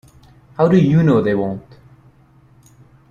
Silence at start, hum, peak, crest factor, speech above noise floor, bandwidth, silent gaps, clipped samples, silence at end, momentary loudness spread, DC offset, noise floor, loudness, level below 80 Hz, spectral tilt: 0.6 s; none; -2 dBFS; 16 dB; 36 dB; 7 kHz; none; under 0.1%; 1.5 s; 17 LU; under 0.1%; -50 dBFS; -15 LUFS; -50 dBFS; -9.5 dB/octave